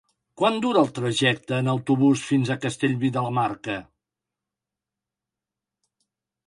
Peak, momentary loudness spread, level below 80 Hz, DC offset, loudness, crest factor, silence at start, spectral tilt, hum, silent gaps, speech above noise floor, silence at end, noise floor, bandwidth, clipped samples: -6 dBFS; 6 LU; -66 dBFS; under 0.1%; -23 LUFS; 18 dB; 0.4 s; -5.5 dB/octave; none; none; 65 dB; 2.65 s; -88 dBFS; 11 kHz; under 0.1%